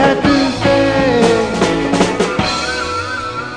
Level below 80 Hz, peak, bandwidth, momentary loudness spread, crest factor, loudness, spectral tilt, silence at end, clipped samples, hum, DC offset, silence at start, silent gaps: -36 dBFS; 0 dBFS; 10 kHz; 7 LU; 14 dB; -14 LUFS; -5 dB/octave; 0 s; under 0.1%; none; 0.4%; 0 s; none